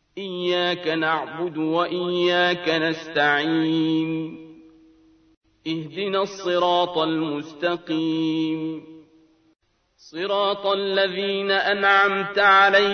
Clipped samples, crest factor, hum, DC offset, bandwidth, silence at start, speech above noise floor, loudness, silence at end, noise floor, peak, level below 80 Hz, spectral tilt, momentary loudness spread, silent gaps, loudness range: under 0.1%; 18 dB; none; under 0.1%; 6.6 kHz; 0.15 s; 36 dB; -22 LUFS; 0 s; -57 dBFS; -4 dBFS; -66 dBFS; -5 dB/octave; 12 LU; 5.37-5.41 s; 5 LU